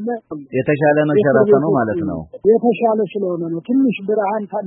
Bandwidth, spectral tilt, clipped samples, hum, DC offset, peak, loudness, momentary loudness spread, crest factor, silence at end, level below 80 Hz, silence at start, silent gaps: 4 kHz; -13 dB/octave; under 0.1%; none; under 0.1%; 0 dBFS; -17 LUFS; 10 LU; 16 dB; 0 s; -54 dBFS; 0 s; none